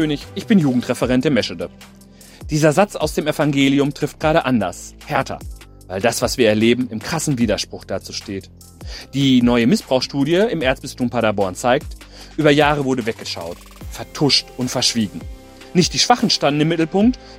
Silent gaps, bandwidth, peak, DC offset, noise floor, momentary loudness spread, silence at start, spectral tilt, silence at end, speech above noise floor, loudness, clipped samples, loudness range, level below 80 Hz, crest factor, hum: none; 16 kHz; 0 dBFS; under 0.1%; -40 dBFS; 17 LU; 0 s; -4.5 dB/octave; 0 s; 22 dB; -18 LUFS; under 0.1%; 2 LU; -40 dBFS; 18 dB; none